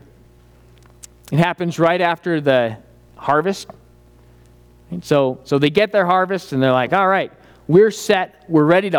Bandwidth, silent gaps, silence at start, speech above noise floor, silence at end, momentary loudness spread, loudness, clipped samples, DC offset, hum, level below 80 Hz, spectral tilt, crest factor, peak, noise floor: 18 kHz; none; 1.3 s; 32 dB; 0 s; 14 LU; -17 LUFS; under 0.1%; under 0.1%; 60 Hz at -50 dBFS; -54 dBFS; -6 dB/octave; 16 dB; -2 dBFS; -48 dBFS